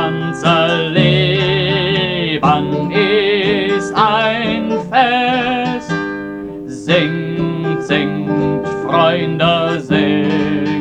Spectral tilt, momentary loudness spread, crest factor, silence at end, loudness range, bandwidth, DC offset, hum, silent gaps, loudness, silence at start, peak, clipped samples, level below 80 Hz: -6.5 dB/octave; 7 LU; 14 dB; 0 s; 4 LU; 9.6 kHz; under 0.1%; none; none; -15 LUFS; 0 s; 0 dBFS; under 0.1%; -44 dBFS